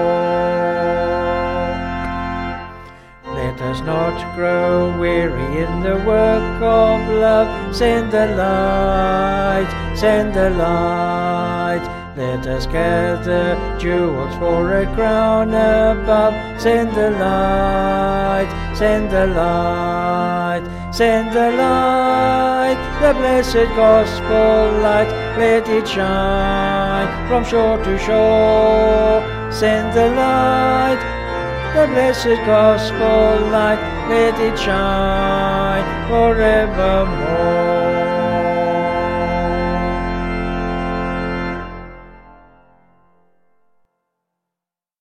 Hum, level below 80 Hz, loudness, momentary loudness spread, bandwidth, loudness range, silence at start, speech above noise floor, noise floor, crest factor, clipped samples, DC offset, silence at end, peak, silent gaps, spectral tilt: none; -28 dBFS; -16 LUFS; 8 LU; 14.5 kHz; 6 LU; 0 s; 71 dB; -86 dBFS; 16 dB; under 0.1%; under 0.1%; 2.85 s; 0 dBFS; none; -6.5 dB/octave